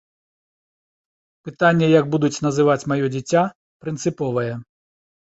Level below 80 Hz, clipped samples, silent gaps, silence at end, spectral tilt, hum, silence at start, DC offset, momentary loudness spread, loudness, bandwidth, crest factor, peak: -60 dBFS; under 0.1%; 3.55-3.80 s; 0.55 s; -6 dB/octave; none; 1.45 s; under 0.1%; 16 LU; -20 LUFS; 8.2 kHz; 18 dB; -2 dBFS